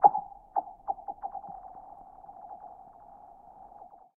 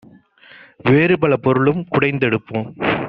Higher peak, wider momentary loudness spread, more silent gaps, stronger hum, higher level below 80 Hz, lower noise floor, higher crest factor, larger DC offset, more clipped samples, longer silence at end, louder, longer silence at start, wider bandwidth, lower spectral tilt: second, -6 dBFS vs -2 dBFS; first, 17 LU vs 8 LU; neither; neither; second, -66 dBFS vs -52 dBFS; first, -52 dBFS vs -46 dBFS; first, 28 dB vs 16 dB; neither; neither; first, 1.45 s vs 0 s; second, -35 LUFS vs -17 LUFS; second, 0 s vs 0.85 s; second, 2.1 kHz vs 5.4 kHz; first, -9.5 dB/octave vs -5.5 dB/octave